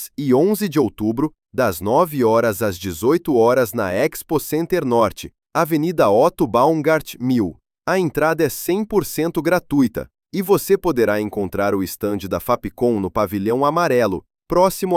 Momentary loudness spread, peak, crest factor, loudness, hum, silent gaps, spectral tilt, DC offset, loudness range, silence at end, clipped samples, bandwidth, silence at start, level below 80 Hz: 7 LU; -2 dBFS; 16 dB; -19 LUFS; none; none; -6 dB/octave; under 0.1%; 2 LU; 0 s; under 0.1%; 17 kHz; 0 s; -46 dBFS